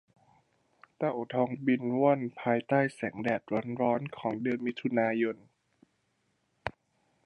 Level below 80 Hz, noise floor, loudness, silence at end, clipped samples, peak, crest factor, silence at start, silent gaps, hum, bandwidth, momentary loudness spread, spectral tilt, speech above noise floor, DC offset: -70 dBFS; -76 dBFS; -31 LUFS; 0.55 s; under 0.1%; -12 dBFS; 20 dB; 1 s; none; none; 10.5 kHz; 8 LU; -8 dB/octave; 46 dB; under 0.1%